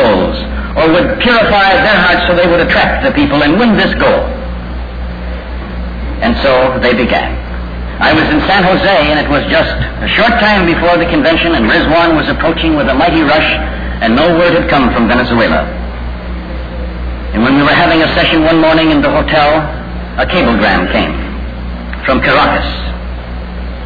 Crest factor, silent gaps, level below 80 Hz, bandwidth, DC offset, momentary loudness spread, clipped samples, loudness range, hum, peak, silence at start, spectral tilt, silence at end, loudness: 10 dB; none; -22 dBFS; 5 kHz; 0.5%; 14 LU; under 0.1%; 4 LU; none; 0 dBFS; 0 s; -7.5 dB/octave; 0 s; -9 LUFS